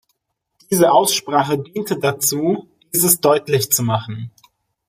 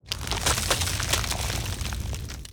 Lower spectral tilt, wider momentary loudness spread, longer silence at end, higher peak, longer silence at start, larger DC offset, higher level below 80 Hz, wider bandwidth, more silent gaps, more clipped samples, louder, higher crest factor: first, -4 dB/octave vs -2.5 dB/octave; about the same, 11 LU vs 9 LU; first, 0.6 s vs 0 s; first, 0 dBFS vs -6 dBFS; first, 0.7 s vs 0.05 s; neither; second, -60 dBFS vs -34 dBFS; second, 15.5 kHz vs over 20 kHz; neither; neither; first, -17 LUFS vs -26 LUFS; about the same, 18 dB vs 22 dB